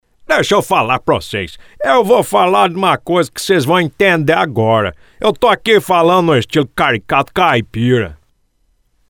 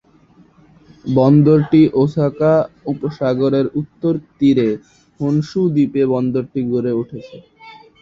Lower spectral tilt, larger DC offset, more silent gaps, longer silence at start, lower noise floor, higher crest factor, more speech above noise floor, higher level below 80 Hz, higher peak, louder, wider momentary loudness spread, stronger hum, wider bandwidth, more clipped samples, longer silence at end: second, -5 dB/octave vs -9.5 dB/octave; neither; neither; second, 0.3 s vs 1.05 s; first, -59 dBFS vs -50 dBFS; about the same, 14 dB vs 14 dB; first, 46 dB vs 34 dB; first, -44 dBFS vs -52 dBFS; about the same, 0 dBFS vs -2 dBFS; first, -13 LUFS vs -16 LUFS; second, 6 LU vs 12 LU; neither; first, 19.5 kHz vs 7.2 kHz; neither; first, 0.95 s vs 0.3 s